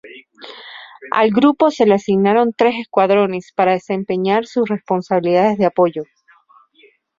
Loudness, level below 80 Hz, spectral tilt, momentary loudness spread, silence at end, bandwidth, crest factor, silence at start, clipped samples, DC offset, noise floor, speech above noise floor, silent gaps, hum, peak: -16 LUFS; -60 dBFS; -7 dB/octave; 21 LU; 1.15 s; 7.6 kHz; 16 dB; 0.05 s; under 0.1%; under 0.1%; -53 dBFS; 38 dB; none; none; 0 dBFS